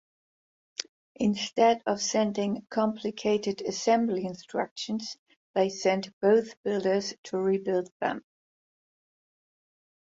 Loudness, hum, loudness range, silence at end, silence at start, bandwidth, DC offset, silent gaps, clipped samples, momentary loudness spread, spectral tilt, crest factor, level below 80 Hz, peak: -28 LUFS; none; 3 LU; 1.9 s; 0.8 s; 7.8 kHz; under 0.1%; 0.89-1.15 s, 4.71-4.76 s, 5.19-5.26 s, 5.37-5.54 s, 6.13-6.21 s, 6.57-6.64 s, 7.18-7.23 s, 7.91-8.00 s; under 0.1%; 12 LU; -4.5 dB/octave; 20 dB; -72 dBFS; -10 dBFS